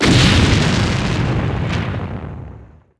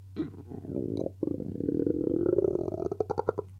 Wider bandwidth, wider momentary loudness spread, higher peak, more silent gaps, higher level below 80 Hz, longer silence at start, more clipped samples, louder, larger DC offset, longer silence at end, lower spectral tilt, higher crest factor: first, 11 kHz vs 7 kHz; first, 19 LU vs 11 LU; first, 0 dBFS vs -12 dBFS; neither; first, -26 dBFS vs -54 dBFS; about the same, 0 s vs 0 s; neither; first, -16 LUFS vs -31 LUFS; neither; first, 0.35 s vs 0 s; second, -5 dB/octave vs -10 dB/octave; about the same, 16 dB vs 18 dB